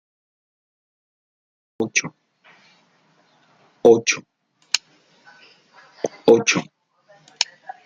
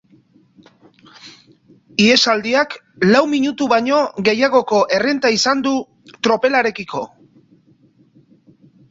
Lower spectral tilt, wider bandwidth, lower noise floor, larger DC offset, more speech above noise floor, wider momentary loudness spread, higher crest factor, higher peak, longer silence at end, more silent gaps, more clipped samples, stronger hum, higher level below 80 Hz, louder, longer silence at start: about the same, -3 dB/octave vs -4 dB/octave; first, 9.4 kHz vs 8 kHz; first, -60 dBFS vs -53 dBFS; neither; first, 42 dB vs 38 dB; first, 14 LU vs 11 LU; first, 24 dB vs 16 dB; about the same, 0 dBFS vs -2 dBFS; second, 0.4 s vs 1.85 s; neither; neither; neither; second, -68 dBFS vs -60 dBFS; second, -20 LUFS vs -16 LUFS; first, 1.8 s vs 1.25 s